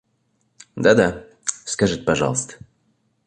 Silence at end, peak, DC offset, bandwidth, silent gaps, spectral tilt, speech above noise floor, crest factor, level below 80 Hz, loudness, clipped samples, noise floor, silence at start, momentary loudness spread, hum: 0.7 s; -2 dBFS; under 0.1%; 11 kHz; none; -4 dB/octave; 49 dB; 20 dB; -48 dBFS; -20 LUFS; under 0.1%; -67 dBFS; 0.75 s; 12 LU; none